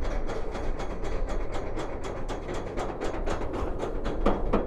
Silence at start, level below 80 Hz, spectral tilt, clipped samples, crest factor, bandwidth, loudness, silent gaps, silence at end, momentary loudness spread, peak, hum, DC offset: 0 s; -32 dBFS; -6.5 dB/octave; under 0.1%; 18 dB; 9 kHz; -33 LUFS; none; 0 s; 6 LU; -10 dBFS; none; under 0.1%